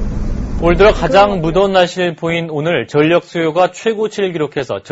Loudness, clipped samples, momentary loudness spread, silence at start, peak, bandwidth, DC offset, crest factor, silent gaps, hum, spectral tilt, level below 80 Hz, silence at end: -14 LUFS; under 0.1%; 9 LU; 0 s; 0 dBFS; 8 kHz; under 0.1%; 14 dB; none; none; -6 dB/octave; -26 dBFS; 0 s